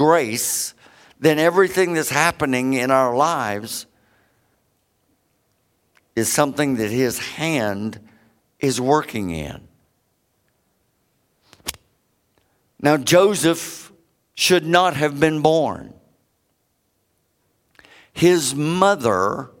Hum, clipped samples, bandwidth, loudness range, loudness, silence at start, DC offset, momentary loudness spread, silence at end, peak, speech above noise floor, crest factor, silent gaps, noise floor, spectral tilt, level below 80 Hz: none; under 0.1%; 17 kHz; 9 LU; -19 LUFS; 0 s; under 0.1%; 15 LU; 0.15 s; 0 dBFS; 50 dB; 22 dB; none; -68 dBFS; -4 dB/octave; -54 dBFS